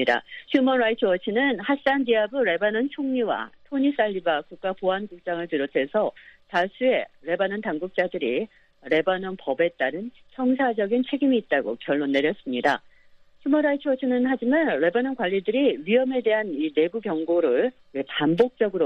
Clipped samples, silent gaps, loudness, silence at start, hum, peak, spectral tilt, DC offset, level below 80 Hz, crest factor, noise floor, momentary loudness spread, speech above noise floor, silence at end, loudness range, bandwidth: under 0.1%; none; -24 LUFS; 0 s; none; -6 dBFS; -7 dB/octave; under 0.1%; -66 dBFS; 16 dB; -53 dBFS; 7 LU; 30 dB; 0 s; 3 LU; 6.4 kHz